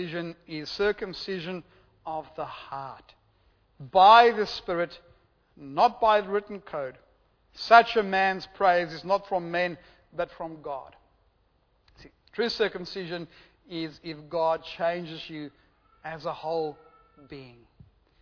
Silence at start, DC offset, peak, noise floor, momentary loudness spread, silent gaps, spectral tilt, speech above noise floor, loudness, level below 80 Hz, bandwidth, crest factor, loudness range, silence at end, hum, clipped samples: 0 s; under 0.1%; -4 dBFS; -68 dBFS; 22 LU; none; -5 dB/octave; 41 dB; -26 LUFS; -62 dBFS; 5.4 kHz; 24 dB; 12 LU; 0.75 s; none; under 0.1%